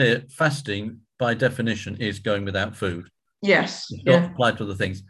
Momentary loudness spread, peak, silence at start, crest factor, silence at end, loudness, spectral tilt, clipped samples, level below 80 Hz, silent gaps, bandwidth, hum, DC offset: 10 LU; -4 dBFS; 0 s; 20 dB; 0.05 s; -23 LUFS; -5.5 dB/octave; under 0.1%; -50 dBFS; none; 12.5 kHz; none; under 0.1%